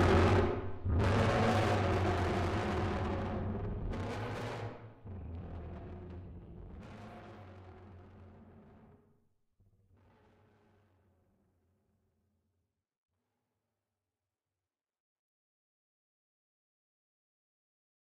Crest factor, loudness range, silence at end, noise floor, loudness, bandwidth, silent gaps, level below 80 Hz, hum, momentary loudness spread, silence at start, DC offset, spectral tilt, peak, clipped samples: 20 dB; 22 LU; 9.45 s; under -90 dBFS; -34 LUFS; 11.5 kHz; none; -48 dBFS; none; 23 LU; 0 s; under 0.1%; -7 dB/octave; -18 dBFS; under 0.1%